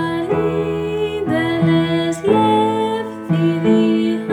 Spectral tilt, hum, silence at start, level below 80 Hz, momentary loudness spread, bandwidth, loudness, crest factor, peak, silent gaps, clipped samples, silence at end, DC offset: -7 dB/octave; none; 0 s; -48 dBFS; 6 LU; 11.5 kHz; -17 LUFS; 14 dB; -2 dBFS; none; under 0.1%; 0 s; under 0.1%